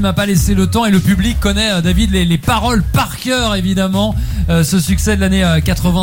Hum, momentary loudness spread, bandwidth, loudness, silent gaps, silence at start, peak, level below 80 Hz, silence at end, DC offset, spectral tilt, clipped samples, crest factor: none; 3 LU; 17 kHz; -14 LUFS; none; 0 s; -2 dBFS; -22 dBFS; 0 s; under 0.1%; -5 dB/octave; under 0.1%; 12 dB